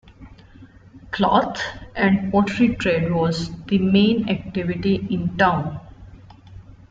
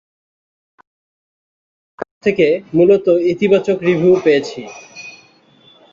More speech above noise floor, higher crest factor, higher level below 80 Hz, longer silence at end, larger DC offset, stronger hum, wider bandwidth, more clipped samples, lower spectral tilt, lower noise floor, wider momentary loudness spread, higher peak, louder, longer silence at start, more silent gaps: second, 26 dB vs 36 dB; about the same, 18 dB vs 16 dB; first, -46 dBFS vs -58 dBFS; second, 0.2 s vs 0.8 s; neither; neither; about the same, 7.8 kHz vs 7.4 kHz; neither; about the same, -7 dB/octave vs -6.5 dB/octave; about the same, -46 dBFS vs -49 dBFS; second, 10 LU vs 21 LU; about the same, -2 dBFS vs -2 dBFS; second, -20 LUFS vs -14 LUFS; second, 0.2 s vs 2 s; second, none vs 2.11-2.21 s